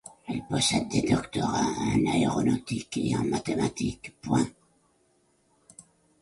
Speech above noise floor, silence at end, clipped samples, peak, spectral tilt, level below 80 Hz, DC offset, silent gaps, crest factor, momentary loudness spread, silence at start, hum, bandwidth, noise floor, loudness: 41 dB; 0.4 s; under 0.1%; -10 dBFS; -5 dB/octave; -52 dBFS; under 0.1%; none; 18 dB; 8 LU; 0.05 s; none; 11.5 kHz; -68 dBFS; -27 LUFS